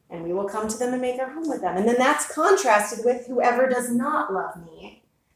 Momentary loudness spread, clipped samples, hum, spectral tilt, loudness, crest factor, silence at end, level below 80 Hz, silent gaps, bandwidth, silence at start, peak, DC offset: 9 LU; under 0.1%; none; -3.5 dB/octave; -23 LUFS; 18 dB; 0.45 s; -62 dBFS; none; 16 kHz; 0.1 s; -6 dBFS; under 0.1%